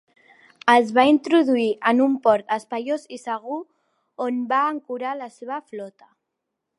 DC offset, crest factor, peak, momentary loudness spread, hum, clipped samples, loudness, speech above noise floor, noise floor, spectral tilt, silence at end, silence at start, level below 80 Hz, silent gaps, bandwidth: under 0.1%; 22 dB; -2 dBFS; 16 LU; none; under 0.1%; -21 LUFS; 60 dB; -81 dBFS; -4.5 dB/octave; 0.9 s; 0.65 s; -74 dBFS; none; 11.5 kHz